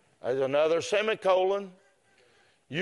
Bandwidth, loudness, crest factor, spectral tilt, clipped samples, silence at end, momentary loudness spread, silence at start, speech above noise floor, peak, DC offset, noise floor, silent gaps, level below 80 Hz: 11.5 kHz; -27 LUFS; 16 dB; -4.5 dB/octave; under 0.1%; 0 s; 9 LU; 0.25 s; 38 dB; -12 dBFS; under 0.1%; -64 dBFS; none; -76 dBFS